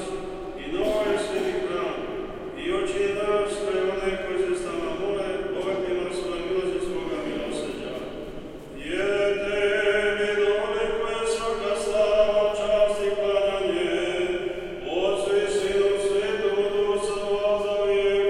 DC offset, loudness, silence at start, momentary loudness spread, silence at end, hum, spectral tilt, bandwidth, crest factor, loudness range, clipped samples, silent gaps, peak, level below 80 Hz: under 0.1%; -25 LUFS; 0 s; 10 LU; 0 s; none; -4 dB/octave; 12 kHz; 16 dB; 5 LU; under 0.1%; none; -10 dBFS; -46 dBFS